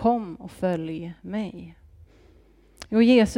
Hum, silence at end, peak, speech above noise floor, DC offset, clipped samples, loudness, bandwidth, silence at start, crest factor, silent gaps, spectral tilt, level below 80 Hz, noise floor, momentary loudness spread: none; 0 s; -8 dBFS; 33 dB; under 0.1%; under 0.1%; -25 LUFS; 11.5 kHz; 0 s; 18 dB; none; -6.5 dB/octave; -50 dBFS; -55 dBFS; 25 LU